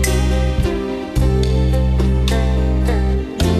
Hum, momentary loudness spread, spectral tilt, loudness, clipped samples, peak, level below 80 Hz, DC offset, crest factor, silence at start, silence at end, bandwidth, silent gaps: none; 4 LU; -6 dB/octave; -18 LUFS; under 0.1%; -4 dBFS; -18 dBFS; under 0.1%; 12 dB; 0 s; 0 s; 13 kHz; none